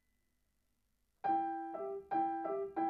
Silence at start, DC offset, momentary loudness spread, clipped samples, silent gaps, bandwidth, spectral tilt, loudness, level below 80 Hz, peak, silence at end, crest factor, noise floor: 1.25 s; under 0.1%; 6 LU; under 0.1%; none; 5 kHz; -8 dB/octave; -38 LUFS; -80 dBFS; -24 dBFS; 0 s; 16 dB; -81 dBFS